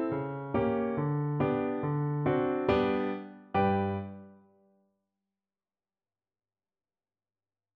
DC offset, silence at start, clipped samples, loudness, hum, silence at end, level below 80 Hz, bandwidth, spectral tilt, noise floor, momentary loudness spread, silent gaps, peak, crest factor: under 0.1%; 0 s; under 0.1%; -31 LUFS; none; 3.4 s; -58 dBFS; 5.4 kHz; -10 dB/octave; under -90 dBFS; 8 LU; none; -14 dBFS; 18 dB